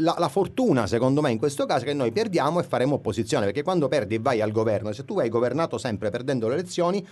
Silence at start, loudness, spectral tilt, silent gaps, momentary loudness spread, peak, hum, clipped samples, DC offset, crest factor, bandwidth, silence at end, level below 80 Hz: 0 s; -24 LUFS; -6 dB/octave; none; 4 LU; -8 dBFS; none; under 0.1%; under 0.1%; 16 dB; 12 kHz; 0 s; -58 dBFS